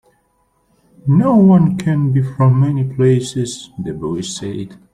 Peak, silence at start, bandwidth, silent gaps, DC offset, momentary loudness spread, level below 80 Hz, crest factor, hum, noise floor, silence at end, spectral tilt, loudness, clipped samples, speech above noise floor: -2 dBFS; 1.05 s; 11 kHz; none; under 0.1%; 15 LU; -50 dBFS; 14 dB; none; -61 dBFS; 0.2 s; -7.5 dB/octave; -15 LUFS; under 0.1%; 47 dB